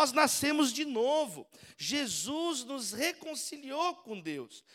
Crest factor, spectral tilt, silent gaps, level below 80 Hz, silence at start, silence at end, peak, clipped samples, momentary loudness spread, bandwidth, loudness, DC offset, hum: 22 dB; -2 dB/octave; none; -76 dBFS; 0 s; 0.15 s; -10 dBFS; under 0.1%; 13 LU; 17 kHz; -32 LUFS; under 0.1%; none